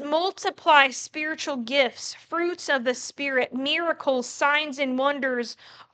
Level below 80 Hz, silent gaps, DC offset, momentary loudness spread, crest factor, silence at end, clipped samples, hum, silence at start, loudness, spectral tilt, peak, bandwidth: -80 dBFS; none; under 0.1%; 11 LU; 24 dB; 0.1 s; under 0.1%; none; 0 s; -24 LUFS; -1.5 dB/octave; -2 dBFS; 9.2 kHz